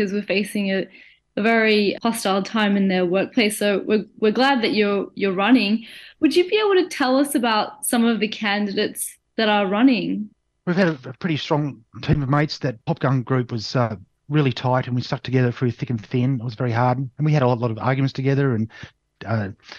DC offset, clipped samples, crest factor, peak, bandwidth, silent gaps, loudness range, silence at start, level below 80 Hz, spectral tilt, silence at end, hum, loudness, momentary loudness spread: under 0.1%; under 0.1%; 16 dB; -4 dBFS; 12.5 kHz; none; 3 LU; 0 s; -52 dBFS; -5.5 dB/octave; 0 s; none; -21 LUFS; 8 LU